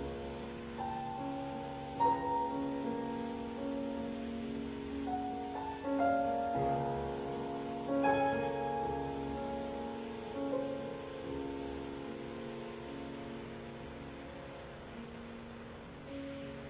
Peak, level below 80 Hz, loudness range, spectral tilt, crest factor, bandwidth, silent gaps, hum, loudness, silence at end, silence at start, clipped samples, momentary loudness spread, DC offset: -20 dBFS; -58 dBFS; 11 LU; -5.5 dB/octave; 18 dB; 4 kHz; none; none; -39 LUFS; 0 s; 0 s; under 0.1%; 15 LU; under 0.1%